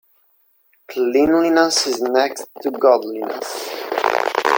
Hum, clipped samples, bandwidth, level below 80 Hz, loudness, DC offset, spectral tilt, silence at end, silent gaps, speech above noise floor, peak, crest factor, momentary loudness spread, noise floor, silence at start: none; under 0.1%; 17 kHz; -58 dBFS; -18 LUFS; under 0.1%; -2 dB/octave; 0 s; none; 42 dB; 0 dBFS; 18 dB; 12 LU; -60 dBFS; 0.9 s